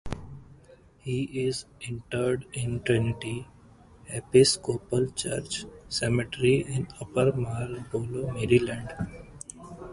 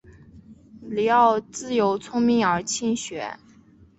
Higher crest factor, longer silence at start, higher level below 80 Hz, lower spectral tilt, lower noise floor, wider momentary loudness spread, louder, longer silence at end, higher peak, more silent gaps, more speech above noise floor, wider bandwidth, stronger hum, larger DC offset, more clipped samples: about the same, 22 dB vs 18 dB; about the same, 0.05 s vs 0.1 s; first, -50 dBFS vs -58 dBFS; about the same, -5 dB/octave vs -4 dB/octave; about the same, -55 dBFS vs -53 dBFS; about the same, 16 LU vs 14 LU; second, -28 LUFS vs -22 LUFS; second, 0 s vs 0.65 s; about the same, -6 dBFS vs -6 dBFS; neither; second, 27 dB vs 31 dB; first, 11.5 kHz vs 8.2 kHz; neither; neither; neither